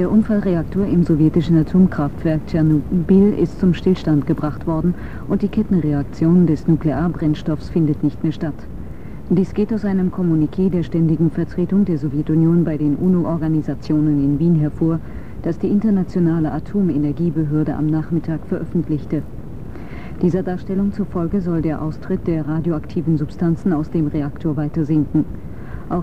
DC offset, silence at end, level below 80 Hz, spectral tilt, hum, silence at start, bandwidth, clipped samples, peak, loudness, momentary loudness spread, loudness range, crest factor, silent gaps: 2%; 0 s; -36 dBFS; -10 dB/octave; none; 0 s; 6.6 kHz; under 0.1%; -4 dBFS; -19 LUFS; 10 LU; 5 LU; 14 dB; none